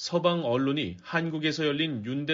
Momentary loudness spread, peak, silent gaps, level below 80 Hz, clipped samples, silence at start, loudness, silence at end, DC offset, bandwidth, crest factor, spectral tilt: 5 LU; -12 dBFS; none; -66 dBFS; under 0.1%; 0 s; -28 LUFS; 0 s; under 0.1%; 7.4 kHz; 16 dB; -4 dB/octave